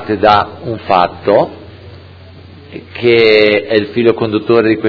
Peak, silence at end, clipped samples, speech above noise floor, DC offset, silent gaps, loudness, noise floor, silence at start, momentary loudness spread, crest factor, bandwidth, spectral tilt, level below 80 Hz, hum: 0 dBFS; 0 s; 0.4%; 24 dB; under 0.1%; none; -11 LUFS; -35 dBFS; 0 s; 14 LU; 12 dB; 5.4 kHz; -7.5 dB/octave; -46 dBFS; none